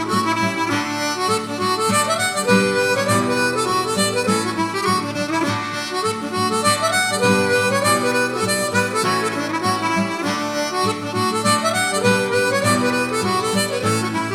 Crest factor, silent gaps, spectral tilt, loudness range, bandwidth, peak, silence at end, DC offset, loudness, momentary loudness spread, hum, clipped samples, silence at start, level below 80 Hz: 18 dB; none; -3.5 dB/octave; 2 LU; 16.5 kHz; -2 dBFS; 0 s; under 0.1%; -19 LUFS; 5 LU; none; under 0.1%; 0 s; -60 dBFS